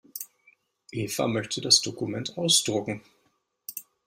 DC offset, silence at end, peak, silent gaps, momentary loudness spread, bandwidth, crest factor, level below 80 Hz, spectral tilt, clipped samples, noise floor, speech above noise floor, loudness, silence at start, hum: under 0.1%; 0.25 s; -4 dBFS; none; 19 LU; 16 kHz; 26 dB; -66 dBFS; -2.5 dB/octave; under 0.1%; -72 dBFS; 45 dB; -24 LUFS; 0.15 s; none